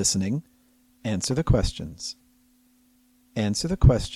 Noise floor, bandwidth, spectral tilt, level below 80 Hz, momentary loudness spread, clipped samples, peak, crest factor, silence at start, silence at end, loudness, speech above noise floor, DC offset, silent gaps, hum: -61 dBFS; 14 kHz; -5 dB/octave; -32 dBFS; 16 LU; under 0.1%; -4 dBFS; 22 dB; 0 s; 0 s; -26 LUFS; 38 dB; under 0.1%; none; none